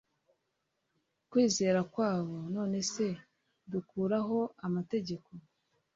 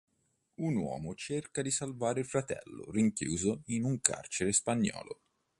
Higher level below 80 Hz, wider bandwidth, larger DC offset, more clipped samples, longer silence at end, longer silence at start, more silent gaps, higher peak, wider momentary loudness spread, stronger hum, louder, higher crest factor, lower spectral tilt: second, -72 dBFS vs -62 dBFS; second, 8 kHz vs 11.5 kHz; neither; neither; about the same, 0.55 s vs 0.45 s; first, 1.3 s vs 0.6 s; neither; second, -16 dBFS vs -6 dBFS; about the same, 11 LU vs 11 LU; neither; about the same, -33 LUFS vs -33 LUFS; second, 18 dB vs 28 dB; about the same, -5 dB/octave vs -4.5 dB/octave